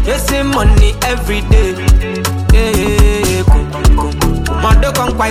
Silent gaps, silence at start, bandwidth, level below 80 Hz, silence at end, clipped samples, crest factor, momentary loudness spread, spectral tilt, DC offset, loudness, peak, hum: none; 0 s; 16 kHz; -12 dBFS; 0 s; under 0.1%; 10 dB; 4 LU; -5 dB/octave; under 0.1%; -12 LUFS; 0 dBFS; none